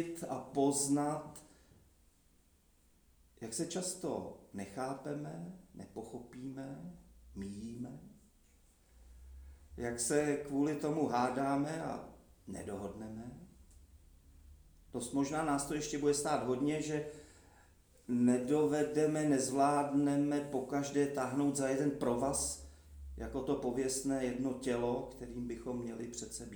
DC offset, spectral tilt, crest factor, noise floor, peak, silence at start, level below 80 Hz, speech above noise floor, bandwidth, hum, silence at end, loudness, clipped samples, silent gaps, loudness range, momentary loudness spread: under 0.1%; -5 dB/octave; 20 dB; -69 dBFS; -18 dBFS; 0 s; -60 dBFS; 33 dB; over 20 kHz; none; 0 s; -36 LUFS; under 0.1%; none; 14 LU; 18 LU